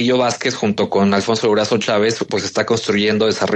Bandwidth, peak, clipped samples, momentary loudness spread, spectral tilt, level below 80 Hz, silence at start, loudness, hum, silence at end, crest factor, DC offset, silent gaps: 9 kHz; -2 dBFS; under 0.1%; 3 LU; -4.5 dB/octave; -58 dBFS; 0 s; -17 LUFS; none; 0 s; 16 dB; under 0.1%; none